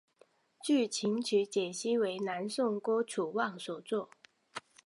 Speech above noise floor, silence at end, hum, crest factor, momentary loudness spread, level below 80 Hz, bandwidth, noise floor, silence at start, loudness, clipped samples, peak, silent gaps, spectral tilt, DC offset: 35 dB; 0.25 s; none; 16 dB; 12 LU; -88 dBFS; 11.5 kHz; -67 dBFS; 0.65 s; -33 LUFS; under 0.1%; -18 dBFS; none; -4 dB/octave; under 0.1%